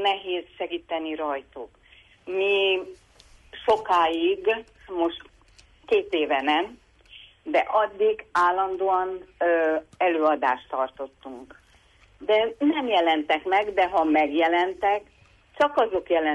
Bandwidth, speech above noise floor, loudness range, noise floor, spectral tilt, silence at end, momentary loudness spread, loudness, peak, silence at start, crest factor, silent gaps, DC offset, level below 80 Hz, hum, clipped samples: 11 kHz; 33 dB; 4 LU; -57 dBFS; -4.5 dB/octave; 0 s; 14 LU; -24 LUFS; -10 dBFS; 0 s; 14 dB; none; under 0.1%; -60 dBFS; none; under 0.1%